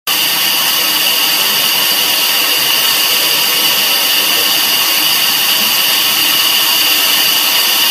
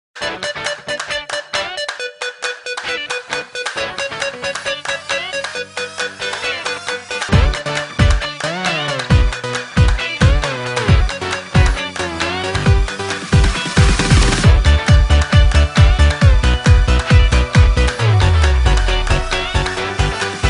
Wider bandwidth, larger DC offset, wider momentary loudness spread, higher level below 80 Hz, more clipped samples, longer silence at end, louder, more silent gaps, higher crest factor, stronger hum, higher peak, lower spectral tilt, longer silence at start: first, 16.5 kHz vs 11 kHz; neither; second, 1 LU vs 10 LU; second, -66 dBFS vs -18 dBFS; neither; about the same, 0 s vs 0 s; first, -9 LUFS vs -16 LUFS; neither; about the same, 12 dB vs 14 dB; neither; about the same, 0 dBFS vs 0 dBFS; second, 1.5 dB/octave vs -5 dB/octave; about the same, 0.05 s vs 0.15 s